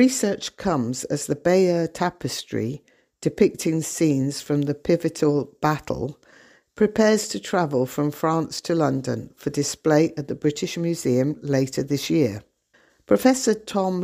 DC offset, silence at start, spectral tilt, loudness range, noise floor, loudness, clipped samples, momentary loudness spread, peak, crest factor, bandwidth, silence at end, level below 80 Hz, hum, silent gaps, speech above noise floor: under 0.1%; 0 s; -5.5 dB/octave; 1 LU; -61 dBFS; -23 LUFS; under 0.1%; 9 LU; -4 dBFS; 20 dB; 15.5 kHz; 0 s; -56 dBFS; none; none; 39 dB